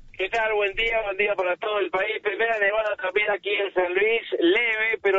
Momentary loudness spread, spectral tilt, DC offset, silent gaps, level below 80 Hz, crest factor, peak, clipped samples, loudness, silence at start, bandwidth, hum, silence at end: 4 LU; 0.5 dB/octave; under 0.1%; none; -52 dBFS; 14 dB; -10 dBFS; under 0.1%; -23 LUFS; 0.05 s; 7.6 kHz; none; 0 s